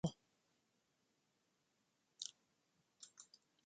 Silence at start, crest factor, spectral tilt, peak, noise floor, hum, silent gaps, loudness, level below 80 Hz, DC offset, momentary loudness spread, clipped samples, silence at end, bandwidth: 0.05 s; 28 dB; -5 dB/octave; -26 dBFS; -84 dBFS; none; none; -53 LUFS; -78 dBFS; under 0.1%; 15 LU; under 0.1%; 0.4 s; 9.4 kHz